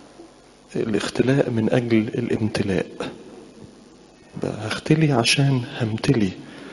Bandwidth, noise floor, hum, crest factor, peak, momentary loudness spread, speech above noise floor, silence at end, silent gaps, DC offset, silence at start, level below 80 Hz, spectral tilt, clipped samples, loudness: 11.5 kHz; -48 dBFS; none; 20 dB; -2 dBFS; 16 LU; 27 dB; 0 s; none; under 0.1%; 0 s; -52 dBFS; -5.5 dB/octave; under 0.1%; -22 LUFS